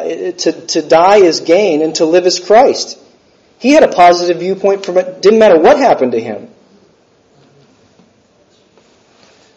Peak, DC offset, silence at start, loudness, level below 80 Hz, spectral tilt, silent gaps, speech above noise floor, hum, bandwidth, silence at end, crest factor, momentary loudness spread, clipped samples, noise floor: 0 dBFS; under 0.1%; 0 s; -10 LUFS; -52 dBFS; -4 dB/octave; none; 41 dB; none; 8.2 kHz; 3.1 s; 12 dB; 11 LU; 0.4%; -50 dBFS